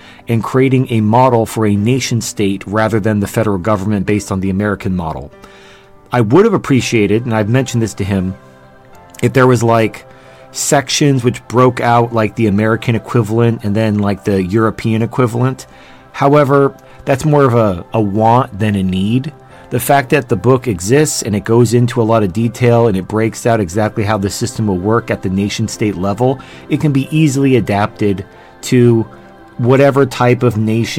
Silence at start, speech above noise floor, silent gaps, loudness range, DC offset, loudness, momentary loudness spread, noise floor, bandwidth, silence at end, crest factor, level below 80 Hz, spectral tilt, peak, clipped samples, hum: 0.05 s; 28 dB; none; 3 LU; under 0.1%; -13 LUFS; 8 LU; -40 dBFS; 16.5 kHz; 0 s; 14 dB; -46 dBFS; -6 dB/octave; 0 dBFS; under 0.1%; none